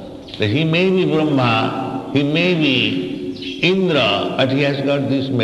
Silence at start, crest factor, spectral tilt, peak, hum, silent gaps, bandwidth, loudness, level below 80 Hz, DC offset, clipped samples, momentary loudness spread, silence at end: 0 s; 16 dB; -6.5 dB/octave; -2 dBFS; none; none; 11.5 kHz; -17 LUFS; -52 dBFS; under 0.1%; under 0.1%; 8 LU; 0 s